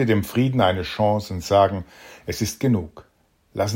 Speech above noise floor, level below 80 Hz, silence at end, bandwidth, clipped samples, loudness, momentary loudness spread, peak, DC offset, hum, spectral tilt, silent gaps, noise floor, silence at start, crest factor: 41 dB; -50 dBFS; 0 s; 16.5 kHz; under 0.1%; -22 LUFS; 16 LU; -4 dBFS; under 0.1%; none; -6 dB/octave; none; -62 dBFS; 0 s; 18 dB